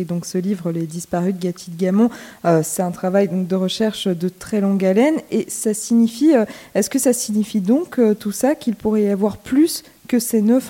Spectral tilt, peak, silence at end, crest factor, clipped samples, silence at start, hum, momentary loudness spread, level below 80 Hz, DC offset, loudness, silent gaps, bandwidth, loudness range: -5.5 dB/octave; -4 dBFS; 0 s; 14 dB; under 0.1%; 0 s; none; 7 LU; -56 dBFS; under 0.1%; -19 LUFS; none; 17 kHz; 2 LU